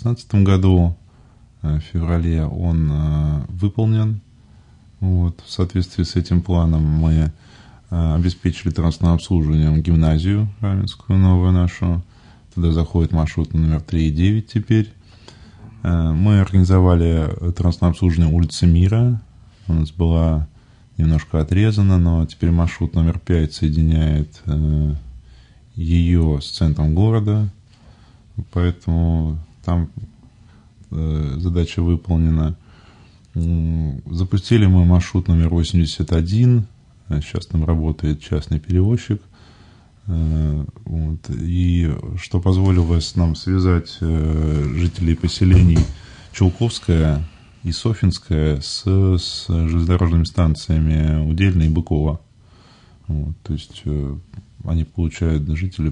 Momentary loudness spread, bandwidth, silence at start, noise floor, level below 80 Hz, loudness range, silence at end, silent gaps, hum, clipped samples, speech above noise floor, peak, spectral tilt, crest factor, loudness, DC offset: 11 LU; 9.8 kHz; 0 s; -48 dBFS; -30 dBFS; 5 LU; 0 s; none; none; under 0.1%; 31 dB; -2 dBFS; -7.5 dB/octave; 14 dB; -19 LUFS; under 0.1%